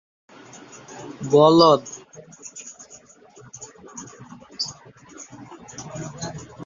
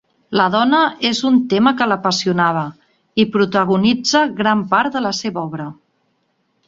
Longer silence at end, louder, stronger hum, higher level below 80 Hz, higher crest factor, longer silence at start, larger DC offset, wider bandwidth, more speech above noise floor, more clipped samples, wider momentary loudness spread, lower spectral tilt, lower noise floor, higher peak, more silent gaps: second, 0 s vs 0.95 s; second, -19 LUFS vs -16 LUFS; neither; about the same, -62 dBFS vs -58 dBFS; first, 22 dB vs 16 dB; first, 0.95 s vs 0.3 s; neither; about the same, 7.6 kHz vs 7.8 kHz; second, 32 dB vs 50 dB; neither; first, 28 LU vs 10 LU; about the same, -5 dB/octave vs -4.5 dB/octave; second, -49 dBFS vs -65 dBFS; about the same, -2 dBFS vs -2 dBFS; neither